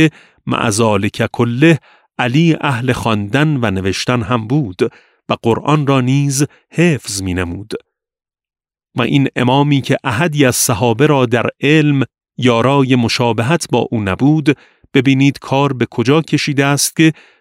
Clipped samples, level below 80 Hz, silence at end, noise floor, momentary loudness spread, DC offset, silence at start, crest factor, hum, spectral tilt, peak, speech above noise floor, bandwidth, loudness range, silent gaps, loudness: under 0.1%; -48 dBFS; 0.3 s; under -90 dBFS; 8 LU; under 0.1%; 0 s; 14 dB; none; -5.5 dB/octave; 0 dBFS; over 76 dB; 16 kHz; 4 LU; none; -14 LUFS